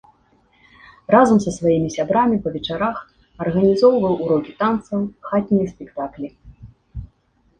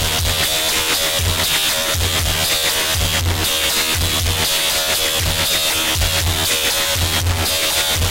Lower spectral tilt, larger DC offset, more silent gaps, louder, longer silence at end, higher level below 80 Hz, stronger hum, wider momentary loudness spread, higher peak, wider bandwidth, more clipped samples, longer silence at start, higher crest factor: first, -6.5 dB/octave vs -1.5 dB/octave; neither; neither; second, -19 LUFS vs -15 LUFS; first, 0.55 s vs 0 s; second, -48 dBFS vs -30 dBFS; neither; first, 19 LU vs 2 LU; about the same, -2 dBFS vs -4 dBFS; second, 9.4 kHz vs 16 kHz; neither; first, 1.1 s vs 0 s; first, 18 dB vs 12 dB